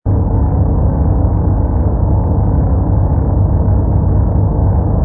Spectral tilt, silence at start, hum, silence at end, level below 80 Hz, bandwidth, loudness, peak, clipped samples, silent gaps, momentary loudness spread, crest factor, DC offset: -17.5 dB/octave; 0.05 s; 50 Hz at -20 dBFS; 0 s; -16 dBFS; 1.9 kHz; -14 LUFS; 0 dBFS; under 0.1%; none; 1 LU; 10 dB; under 0.1%